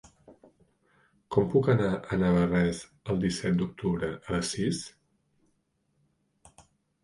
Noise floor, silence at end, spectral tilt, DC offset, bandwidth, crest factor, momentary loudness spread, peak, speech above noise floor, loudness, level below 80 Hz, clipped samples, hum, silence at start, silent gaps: -74 dBFS; 2.15 s; -6.5 dB/octave; under 0.1%; 11.5 kHz; 20 dB; 8 LU; -10 dBFS; 47 dB; -28 LUFS; -52 dBFS; under 0.1%; none; 0.3 s; none